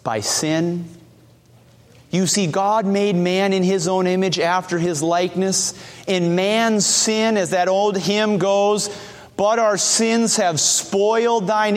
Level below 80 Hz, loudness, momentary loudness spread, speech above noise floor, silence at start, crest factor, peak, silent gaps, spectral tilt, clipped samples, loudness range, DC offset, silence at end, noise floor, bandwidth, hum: -62 dBFS; -18 LUFS; 6 LU; 32 dB; 0.05 s; 14 dB; -4 dBFS; none; -3.5 dB/octave; under 0.1%; 3 LU; under 0.1%; 0 s; -50 dBFS; 16 kHz; none